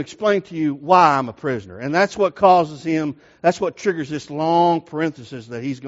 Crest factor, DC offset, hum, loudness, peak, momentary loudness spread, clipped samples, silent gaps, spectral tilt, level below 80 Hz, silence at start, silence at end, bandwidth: 18 dB; under 0.1%; none; -19 LUFS; 0 dBFS; 13 LU; under 0.1%; none; -4.5 dB/octave; -62 dBFS; 0 s; 0 s; 8 kHz